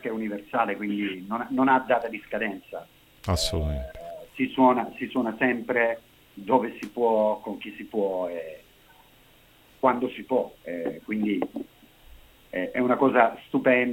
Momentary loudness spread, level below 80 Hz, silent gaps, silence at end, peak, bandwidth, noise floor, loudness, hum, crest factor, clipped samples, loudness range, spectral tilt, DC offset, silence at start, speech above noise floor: 16 LU; -46 dBFS; none; 0 s; -4 dBFS; 17 kHz; -56 dBFS; -26 LUFS; none; 22 dB; under 0.1%; 4 LU; -5.5 dB/octave; under 0.1%; 0 s; 31 dB